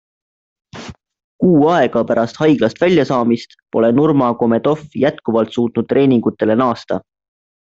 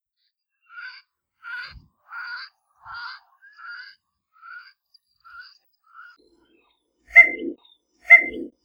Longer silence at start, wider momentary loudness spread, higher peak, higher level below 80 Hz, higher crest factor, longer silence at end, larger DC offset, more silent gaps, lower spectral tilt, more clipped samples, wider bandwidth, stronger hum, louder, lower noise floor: about the same, 0.75 s vs 0.8 s; second, 10 LU vs 28 LU; about the same, -2 dBFS vs 0 dBFS; first, -54 dBFS vs -62 dBFS; second, 14 dB vs 24 dB; first, 0.7 s vs 0.15 s; neither; first, 1.24-1.39 s vs none; first, -7.5 dB/octave vs -3 dB/octave; neither; about the same, 7.8 kHz vs 7.8 kHz; neither; about the same, -15 LUFS vs -14 LUFS; second, -34 dBFS vs -76 dBFS